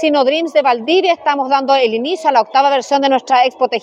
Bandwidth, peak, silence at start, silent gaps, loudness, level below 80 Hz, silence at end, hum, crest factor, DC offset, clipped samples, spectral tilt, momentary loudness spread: 10.5 kHz; -2 dBFS; 0 s; none; -13 LUFS; -74 dBFS; 0 s; none; 12 dB; under 0.1%; under 0.1%; -3 dB/octave; 3 LU